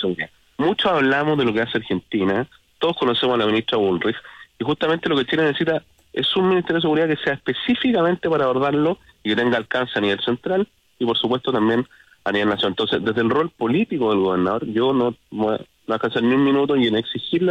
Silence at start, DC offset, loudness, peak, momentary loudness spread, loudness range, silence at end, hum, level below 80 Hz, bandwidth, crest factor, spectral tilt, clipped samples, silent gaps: 0 s; under 0.1%; -20 LUFS; -8 dBFS; 7 LU; 2 LU; 0 s; none; -58 dBFS; 8.8 kHz; 12 dB; -7 dB/octave; under 0.1%; none